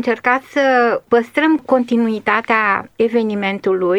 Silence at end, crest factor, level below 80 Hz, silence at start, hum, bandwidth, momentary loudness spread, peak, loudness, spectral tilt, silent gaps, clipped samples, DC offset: 0 s; 14 dB; -62 dBFS; 0 s; none; 12 kHz; 4 LU; -2 dBFS; -16 LUFS; -6 dB/octave; none; under 0.1%; under 0.1%